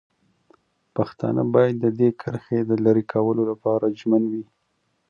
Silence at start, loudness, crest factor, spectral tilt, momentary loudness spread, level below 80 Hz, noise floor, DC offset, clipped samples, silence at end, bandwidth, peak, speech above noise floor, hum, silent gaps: 0.95 s; -22 LUFS; 18 dB; -10 dB/octave; 9 LU; -64 dBFS; -71 dBFS; under 0.1%; under 0.1%; 0.65 s; 6.8 kHz; -4 dBFS; 50 dB; none; none